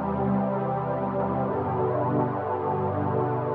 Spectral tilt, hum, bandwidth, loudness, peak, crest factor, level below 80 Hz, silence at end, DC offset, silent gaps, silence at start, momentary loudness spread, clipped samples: -12 dB/octave; none; 4.5 kHz; -27 LUFS; -14 dBFS; 12 dB; -52 dBFS; 0 s; under 0.1%; none; 0 s; 2 LU; under 0.1%